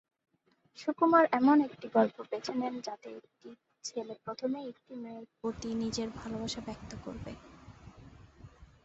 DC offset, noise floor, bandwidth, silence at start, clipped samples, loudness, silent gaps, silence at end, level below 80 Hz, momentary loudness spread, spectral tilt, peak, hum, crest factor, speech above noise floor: under 0.1%; -55 dBFS; 8.2 kHz; 0.75 s; under 0.1%; -32 LUFS; none; 0.2 s; -62 dBFS; 21 LU; -5 dB/octave; -12 dBFS; none; 22 dB; 23 dB